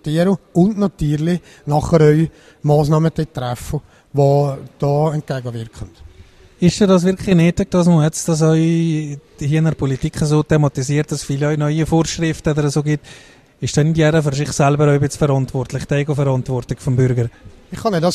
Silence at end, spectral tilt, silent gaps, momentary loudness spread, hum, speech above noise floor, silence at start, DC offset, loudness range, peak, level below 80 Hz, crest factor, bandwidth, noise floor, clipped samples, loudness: 0 s; -6.5 dB/octave; none; 10 LU; none; 28 dB; 0.05 s; under 0.1%; 3 LU; 0 dBFS; -40 dBFS; 16 dB; 13 kHz; -44 dBFS; under 0.1%; -17 LUFS